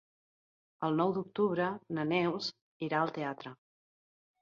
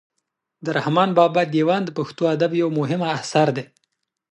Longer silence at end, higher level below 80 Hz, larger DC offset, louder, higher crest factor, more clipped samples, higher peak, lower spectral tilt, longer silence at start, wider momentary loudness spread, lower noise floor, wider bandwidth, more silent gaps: first, 0.85 s vs 0.65 s; second, -80 dBFS vs -70 dBFS; neither; second, -34 LUFS vs -20 LUFS; about the same, 18 dB vs 18 dB; neither; second, -16 dBFS vs -2 dBFS; about the same, -6.5 dB/octave vs -6 dB/octave; first, 0.8 s vs 0.6 s; about the same, 9 LU vs 8 LU; first, under -90 dBFS vs -78 dBFS; second, 7.4 kHz vs 11 kHz; first, 2.61-2.80 s vs none